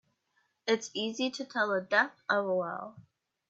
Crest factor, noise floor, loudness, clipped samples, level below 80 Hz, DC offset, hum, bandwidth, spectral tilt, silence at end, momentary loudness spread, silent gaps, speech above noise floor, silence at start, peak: 20 dB; -76 dBFS; -31 LUFS; under 0.1%; -84 dBFS; under 0.1%; none; 8.2 kHz; -3.5 dB/octave; 0.5 s; 11 LU; none; 44 dB; 0.65 s; -12 dBFS